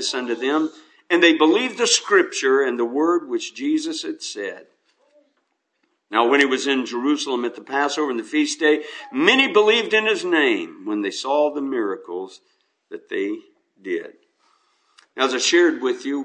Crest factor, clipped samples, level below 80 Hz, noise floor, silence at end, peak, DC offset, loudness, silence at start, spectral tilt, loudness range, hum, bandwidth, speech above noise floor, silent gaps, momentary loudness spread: 22 dB; under 0.1%; -82 dBFS; -72 dBFS; 0 s; 0 dBFS; under 0.1%; -20 LUFS; 0 s; -2 dB/octave; 8 LU; none; 9.8 kHz; 51 dB; none; 13 LU